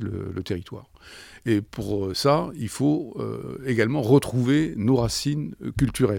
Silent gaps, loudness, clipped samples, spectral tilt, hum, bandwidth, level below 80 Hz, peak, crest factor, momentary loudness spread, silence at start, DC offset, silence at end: none; -24 LUFS; under 0.1%; -6 dB/octave; none; 18 kHz; -46 dBFS; -6 dBFS; 18 dB; 12 LU; 0 s; under 0.1%; 0 s